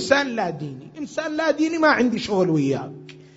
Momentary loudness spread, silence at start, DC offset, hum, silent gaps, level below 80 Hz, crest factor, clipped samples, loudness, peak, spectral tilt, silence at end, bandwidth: 17 LU; 0 s; under 0.1%; none; none; -60 dBFS; 20 dB; under 0.1%; -21 LUFS; -2 dBFS; -5.5 dB/octave; 0.2 s; 8 kHz